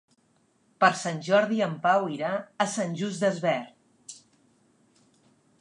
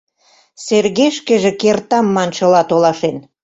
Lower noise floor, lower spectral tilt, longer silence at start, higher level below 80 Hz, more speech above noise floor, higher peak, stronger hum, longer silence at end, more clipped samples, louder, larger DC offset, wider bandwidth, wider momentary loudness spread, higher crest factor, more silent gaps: first, -67 dBFS vs -54 dBFS; about the same, -4.5 dB/octave vs -5 dB/octave; first, 0.8 s vs 0.6 s; second, -82 dBFS vs -56 dBFS; about the same, 41 dB vs 40 dB; second, -6 dBFS vs -2 dBFS; neither; first, 1.45 s vs 0.25 s; neither; second, -26 LUFS vs -14 LUFS; neither; first, 11.5 kHz vs 8 kHz; first, 17 LU vs 6 LU; first, 22 dB vs 14 dB; neither